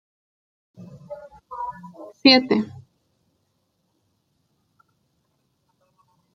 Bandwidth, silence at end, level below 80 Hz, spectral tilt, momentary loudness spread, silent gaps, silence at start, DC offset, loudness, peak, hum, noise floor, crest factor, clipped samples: 6.6 kHz; 3.65 s; -68 dBFS; -5 dB/octave; 26 LU; none; 0.8 s; under 0.1%; -19 LUFS; -2 dBFS; none; -71 dBFS; 26 dB; under 0.1%